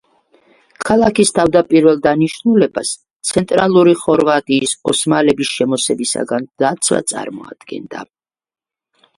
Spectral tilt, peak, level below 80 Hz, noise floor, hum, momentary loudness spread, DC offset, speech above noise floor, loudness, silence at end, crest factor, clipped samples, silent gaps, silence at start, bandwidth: -4 dB/octave; 0 dBFS; -50 dBFS; -58 dBFS; none; 16 LU; under 0.1%; 44 dB; -14 LUFS; 1.15 s; 16 dB; under 0.1%; 3.16-3.20 s; 0.8 s; 11.5 kHz